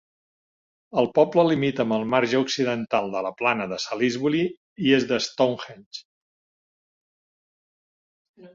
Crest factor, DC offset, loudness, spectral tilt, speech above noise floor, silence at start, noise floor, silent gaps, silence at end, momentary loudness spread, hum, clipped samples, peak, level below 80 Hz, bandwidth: 22 dB; under 0.1%; -23 LUFS; -5 dB/octave; over 67 dB; 0.95 s; under -90 dBFS; 4.57-4.76 s, 5.86-5.91 s, 6.05-8.34 s; 0.05 s; 9 LU; none; under 0.1%; -4 dBFS; -66 dBFS; 7.6 kHz